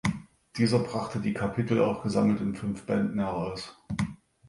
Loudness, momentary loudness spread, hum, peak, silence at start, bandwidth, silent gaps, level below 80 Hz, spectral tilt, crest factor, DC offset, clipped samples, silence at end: -29 LUFS; 10 LU; none; -10 dBFS; 0.05 s; 11.5 kHz; none; -54 dBFS; -7 dB/octave; 18 dB; under 0.1%; under 0.1%; 0.35 s